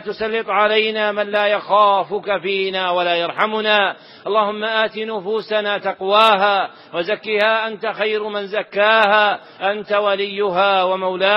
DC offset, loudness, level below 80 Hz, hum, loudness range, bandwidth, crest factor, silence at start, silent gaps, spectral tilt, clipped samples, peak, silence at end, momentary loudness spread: under 0.1%; -17 LUFS; -66 dBFS; none; 2 LU; 10 kHz; 18 dB; 0 s; none; -5 dB/octave; under 0.1%; 0 dBFS; 0 s; 9 LU